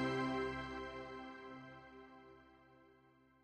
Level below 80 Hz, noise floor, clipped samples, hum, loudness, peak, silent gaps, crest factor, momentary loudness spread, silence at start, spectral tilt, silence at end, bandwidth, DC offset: -66 dBFS; -69 dBFS; under 0.1%; none; -45 LUFS; -28 dBFS; none; 18 dB; 26 LU; 0 s; -6 dB/octave; 0.35 s; 10 kHz; under 0.1%